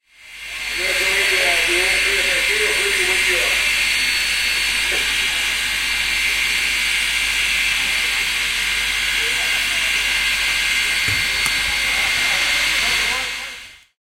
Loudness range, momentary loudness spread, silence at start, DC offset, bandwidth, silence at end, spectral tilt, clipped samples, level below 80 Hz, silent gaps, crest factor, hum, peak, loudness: 2 LU; 3 LU; 0.2 s; under 0.1%; 16 kHz; 0.25 s; 0.5 dB/octave; under 0.1%; -40 dBFS; none; 20 dB; none; 0 dBFS; -16 LUFS